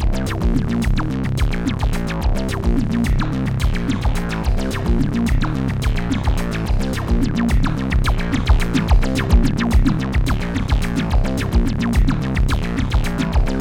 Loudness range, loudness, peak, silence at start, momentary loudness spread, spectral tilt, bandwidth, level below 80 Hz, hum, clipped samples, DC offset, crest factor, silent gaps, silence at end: 2 LU; -20 LUFS; -2 dBFS; 0 s; 4 LU; -6.5 dB/octave; 16.5 kHz; -20 dBFS; none; under 0.1%; under 0.1%; 16 dB; none; 0 s